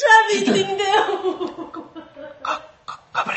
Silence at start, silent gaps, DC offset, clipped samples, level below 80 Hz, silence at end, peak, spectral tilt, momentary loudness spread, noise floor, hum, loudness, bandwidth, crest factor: 0 s; none; under 0.1%; under 0.1%; -64 dBFS; 0 s; 0 dBFS; -3 dB/octave; 22 LU; -39 dBFS; none; -20 LUFS; 8.6 kHz; 20 dB